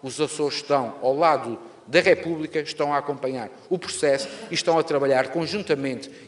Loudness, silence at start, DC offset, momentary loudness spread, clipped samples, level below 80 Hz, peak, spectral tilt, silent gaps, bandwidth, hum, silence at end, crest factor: -23 LUFS; 0.05 s; under 0.1%; 9 LU; under 0.1%; -68 dBFS; -2 dBFS; -4 dB/octave; none; 11.5 kHz; none; 0 s; 20 dB